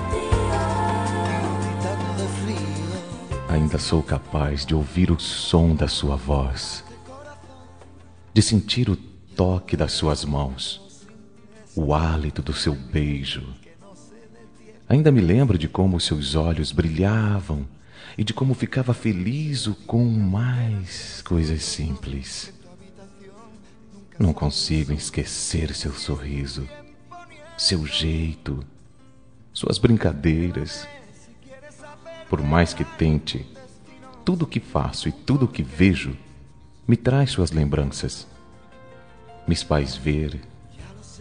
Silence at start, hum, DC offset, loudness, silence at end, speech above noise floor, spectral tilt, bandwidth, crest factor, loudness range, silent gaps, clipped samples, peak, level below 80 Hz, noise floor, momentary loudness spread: 0 s; none; 0.3%; -23 LUFS; 0 s; 30 dB; -5.5 dB/octave; 10 kHz; 22 dB; 5 LU; none; under 0.1%; -2 dBFS; -36 dBFS; -52 dBFS; 14 LU